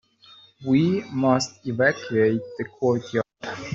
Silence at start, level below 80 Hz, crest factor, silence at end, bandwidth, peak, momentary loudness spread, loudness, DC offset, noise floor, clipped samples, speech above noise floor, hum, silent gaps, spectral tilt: 0.6 s; -62 dBFS; 18 dB; 0 s; 7.8 kHz; -6 dBFS; 11 LU; -23 LUFS; under 0.1%; -52 dBFS; under 0.1%; 30 dB; none; none; -6 dB/octave